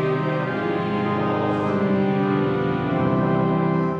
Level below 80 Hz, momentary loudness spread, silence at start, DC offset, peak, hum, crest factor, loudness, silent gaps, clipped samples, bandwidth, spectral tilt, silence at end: -52 dBFS; 3 LU; 0 s; under 0.1%; -8 dBFS; none; 12 dB; -22 LUFS; none; under 0.1%; 6.6 kHz; -9 dB/octave; 0 s